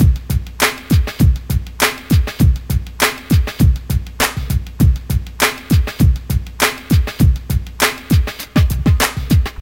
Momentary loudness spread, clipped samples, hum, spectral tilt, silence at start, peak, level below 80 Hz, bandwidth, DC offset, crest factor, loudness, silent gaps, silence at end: 6 LU; under 0.1%; none; -5 dB/octave; 0 s; 0 dBFS; -20 dBFS; 17.5 kHz; under 0.1%; 14 dB; -16 LUFS; none; 0.05 s